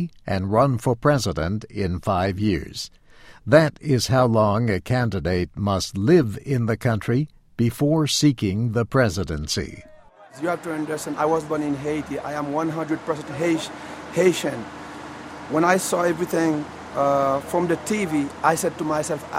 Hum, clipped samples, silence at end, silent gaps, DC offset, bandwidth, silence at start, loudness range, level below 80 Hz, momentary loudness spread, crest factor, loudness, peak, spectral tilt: none; under 0.1%; 0 s; none; under 0.1%; 16 kHz; 0 s; 4 LU; -46 dBFS; 10 LU; 20 dB; -22 LUFS; -2 dBFS; -5.5 dB/octave